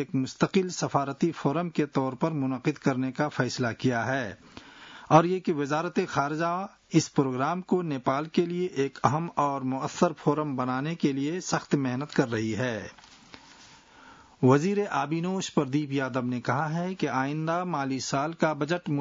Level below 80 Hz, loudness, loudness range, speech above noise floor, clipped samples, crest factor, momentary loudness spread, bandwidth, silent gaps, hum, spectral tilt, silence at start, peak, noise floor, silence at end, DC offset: -66 dBFS; -28 LUFS; 2 LU; 26 dB; under 0.1%; 22 dB; 5 LU; 7.8 kHz; none; none; -6 dB/octave; 0 s; -6 dBFS; -53 dBFS; 0 s; under 0.1%